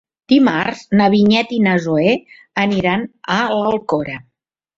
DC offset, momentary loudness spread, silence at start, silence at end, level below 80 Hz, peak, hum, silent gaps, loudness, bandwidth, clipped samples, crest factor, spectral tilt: under 0.1%; 9 LU; 0.3 s; 0.55 s; -54 dBFS; -2 dBFS; none; none; -16 LUFS; 7.6 kHz; under 0.1%; 14 dB; -6.5 dB/octave